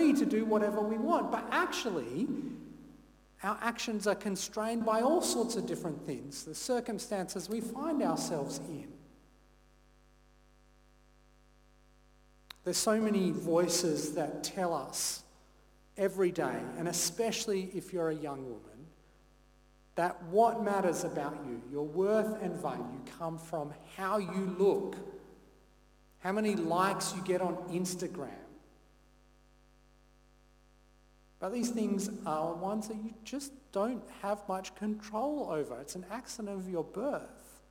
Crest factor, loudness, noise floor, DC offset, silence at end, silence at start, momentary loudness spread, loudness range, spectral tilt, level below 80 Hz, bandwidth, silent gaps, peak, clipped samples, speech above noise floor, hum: 20 dB; -34 LUFS; -64 dBFS; under 0.1%; 0.15 s; 0 s; 13 LU; 6 LU; -4.5 dB/octave; -66 dBFS; 19 kHz; none; -14 dBFS; under 0.1%; 30 dB; 50 Hz at -65 dBFS